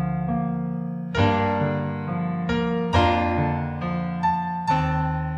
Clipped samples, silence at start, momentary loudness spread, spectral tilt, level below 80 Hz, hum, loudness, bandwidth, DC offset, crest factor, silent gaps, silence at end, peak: under 0.1%; 0 s; 7 LU; -7.5 dB/octave; -40 dBFS; none; -24 LUFS; 8.4 kHz; under 0.1%; 16 dB; none; 0 s; -6 dBFS